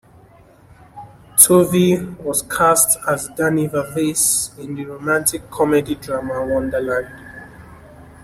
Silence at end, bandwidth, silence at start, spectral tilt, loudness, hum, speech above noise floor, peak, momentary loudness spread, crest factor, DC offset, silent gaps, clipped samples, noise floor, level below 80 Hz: 0.15 s; 16 kHz; 0.95 s; -4 dB/octave; -17 LUFS; none; 30 dB; 0 dBFS; 15 LU; 20 dB; under 0.1%; none; under 0.1%; -47 dBFS; -48 dBFS